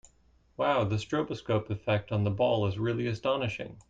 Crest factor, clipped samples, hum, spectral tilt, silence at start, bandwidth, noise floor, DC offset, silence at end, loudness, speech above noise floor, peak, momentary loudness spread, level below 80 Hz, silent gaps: 16 dB; under 0.1%; none; -7 dB/octave; 0.6 s; 7.8 kHz; -64 dBFS; under 0.1%; 0.1 s; -30 LUFS; 35 dB; -14 dBFS; 5 LU; -58 dBFS; none